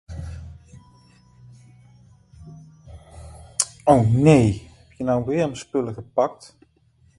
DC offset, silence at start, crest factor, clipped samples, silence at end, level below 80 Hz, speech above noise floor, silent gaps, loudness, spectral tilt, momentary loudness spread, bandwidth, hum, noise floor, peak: under 0.1%; 0.1 s; 24 dB; under 0.1%; 0.85 s; -44 dBFS; 40 dB; none; -21 LUFS; -6 dB/octave; 25 LU; 11.5 kHz; none; -59 dBFS; 0 dBFS